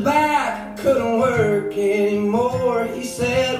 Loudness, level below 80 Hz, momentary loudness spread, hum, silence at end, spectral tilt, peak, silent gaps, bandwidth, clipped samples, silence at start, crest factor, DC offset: -20 LUFS; -50 dBFS; 6 LU; none; 0 s; -5.5 dB/octave; -6 dBFS; none; 15.5 kHz; under 0.1%; 0 s; 14 dB; under 0.1%